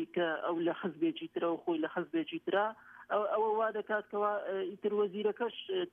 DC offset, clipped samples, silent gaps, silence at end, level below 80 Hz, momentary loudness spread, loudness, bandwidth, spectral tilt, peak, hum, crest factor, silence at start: under 0.1%; under 0.1%; none; 0.05 s; -84 dBFS; 5 LU; -34 LUFS; 3.8 kHz; -7.5 dB/octave; -20 dBFS; none; 14 dB; 0 s